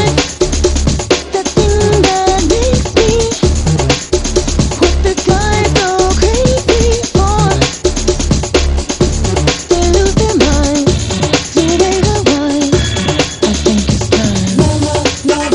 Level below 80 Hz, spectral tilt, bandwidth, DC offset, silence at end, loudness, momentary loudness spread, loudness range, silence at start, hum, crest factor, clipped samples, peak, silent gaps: -18 dBFS; -4.5 dB/octave; 11.5 kHz; under 0.1%; 0 s; -12 LUFS; 3 LU; 1 LU; 0 s; none; 12 dB; under 0.1%; 0 dBFS; none